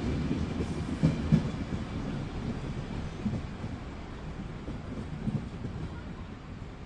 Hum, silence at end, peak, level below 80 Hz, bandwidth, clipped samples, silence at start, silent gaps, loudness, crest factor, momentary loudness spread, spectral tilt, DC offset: none; 0 s; -10 dBFS; -44 dBFS; 10.5 kHz; under 0.1%; 0 s; none; -35 LUFS; 22 dB; 13 LU; -7.5 dB/octave; under 0.1%